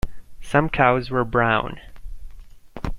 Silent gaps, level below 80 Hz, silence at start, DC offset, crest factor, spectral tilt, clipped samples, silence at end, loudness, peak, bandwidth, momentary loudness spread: none; -36 dBFS; 0.05 s; under 0.1%; 20 dB; -7 dB/octave; under 0.1%; 0 s; -20 LUFS; -2 dBFS; 13.5 kHz; 17 LU